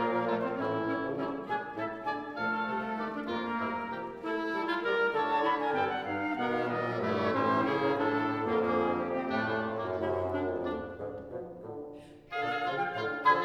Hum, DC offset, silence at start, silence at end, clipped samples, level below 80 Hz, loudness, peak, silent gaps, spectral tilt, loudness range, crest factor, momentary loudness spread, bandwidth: none; under 0.1%; 0 s; 0 s; under 0.1%; -64 dBFS; -32 LUFS; -12 dBFS; none; -7 dB/octave; 5 LU; 18 dB; 9 LU; 9.2 kHz